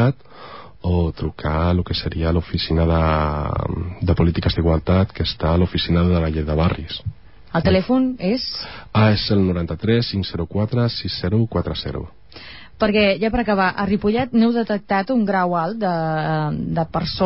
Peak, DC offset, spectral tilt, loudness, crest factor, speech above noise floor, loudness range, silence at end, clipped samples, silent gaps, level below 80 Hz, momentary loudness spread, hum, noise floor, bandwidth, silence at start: -6 dBFS; 0.6%; -11 dB/octave; -20 LUFS; 14 dB; 21 dB; 2 LU; 0 s; under 0.1%; none; -30 dBFS; 9 LU; none; -40 dBFS; 5.8 kHz; 0 s